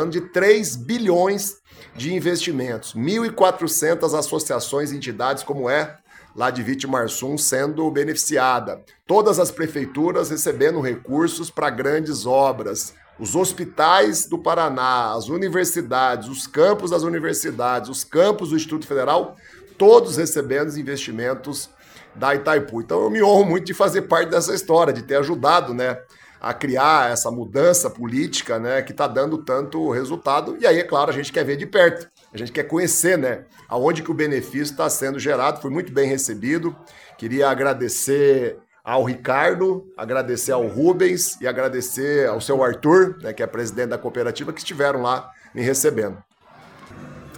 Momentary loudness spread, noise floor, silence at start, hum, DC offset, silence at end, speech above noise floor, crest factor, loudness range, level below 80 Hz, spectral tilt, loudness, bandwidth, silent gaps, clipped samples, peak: 10 LU; -48 dBFS; 0 s; none; under 0.1%; 0 s; 28 dB; 20 dB; 3 LU; -60 dBFS; -4 dB/octave; -20 LUFS; 19 kHz; none; under 0.1%; 0 dBFS